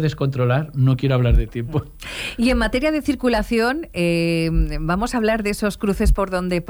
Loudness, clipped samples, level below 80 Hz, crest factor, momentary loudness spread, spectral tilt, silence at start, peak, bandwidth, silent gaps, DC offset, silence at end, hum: -20 LUFS; under 0.1%; -26 dBFS; 14 dB; 6 LU; -6.5 dB/octave; 0 s; -6 dBFS; over 20 kHz; none; under 0.1%; 0 s; none